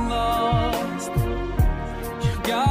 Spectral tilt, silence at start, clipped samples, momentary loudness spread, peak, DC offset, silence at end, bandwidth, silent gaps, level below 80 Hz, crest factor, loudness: -6 dB/octave; 0 s; under 0.1%; 5 LU; -8 dBFS; under 0.1%; 0 s; 16 kHz; none; -30 dBFS; 14 dB; -24 LUFS